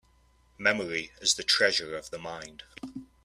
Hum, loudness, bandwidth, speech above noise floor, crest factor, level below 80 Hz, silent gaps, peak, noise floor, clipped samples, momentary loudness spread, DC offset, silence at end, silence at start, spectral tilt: none; -27 LUFS; 15 kHz; 34 dB; 22 dB; -62 dBFS; none; -8 dBFS; -64 dBFS; under 0.1%; 20 LU; under 0.1%; 0.2 s; 0.6 s; -1 dB/octave